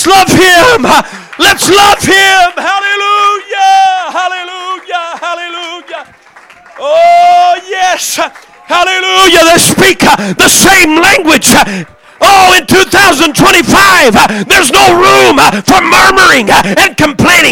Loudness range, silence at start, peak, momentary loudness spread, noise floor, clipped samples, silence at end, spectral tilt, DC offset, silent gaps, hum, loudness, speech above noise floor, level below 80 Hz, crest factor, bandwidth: 7 LU; 0 s; 0 dBFS; 13 LU; -37 dBFS; 2%; 0 s; -2.5 dB/octave; under 0.1%; none; none; -5 LUFS; 32 dB; -34 dBFS; 6 dB; over 20 kHz